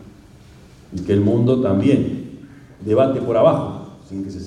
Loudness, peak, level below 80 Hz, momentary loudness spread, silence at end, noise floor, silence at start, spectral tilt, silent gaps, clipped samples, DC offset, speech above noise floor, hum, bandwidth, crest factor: -18 LUFS; -2 dBFS; -50 dBFS; 17 LU; 0 s; -44 dBFS; 0 s; -9 dB/octave; none; under 0.1%; under 0.1%; 28 dB; none; 10.5 kHz; 18 dB